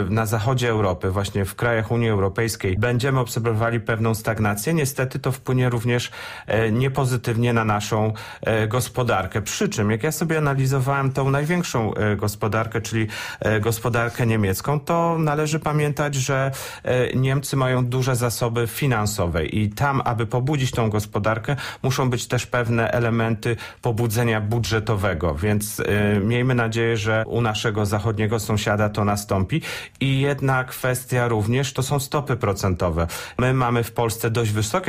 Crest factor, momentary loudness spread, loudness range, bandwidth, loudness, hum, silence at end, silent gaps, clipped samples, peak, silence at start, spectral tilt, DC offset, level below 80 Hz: 14 dB; 4 LU; 1 LU; 15.5 kHz; -22 LUFS; none; 0 s; none; under 0.1%; -8 dBFS; 0 s; -5.5 dB/octave; under 0.1%; -44 dBFS